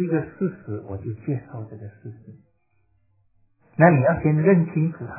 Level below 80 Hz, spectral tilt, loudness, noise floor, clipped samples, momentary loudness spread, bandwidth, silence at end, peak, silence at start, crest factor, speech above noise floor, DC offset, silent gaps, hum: -52 dBFS; -15.5 dB/octave; -21 LUFS; -67 dBFS; under 0.1%; 22 LU; 2.8 kHz; 0 s; 0 dBFS; 0 s; 22 dB; 45 dB; under 0.1%; none; none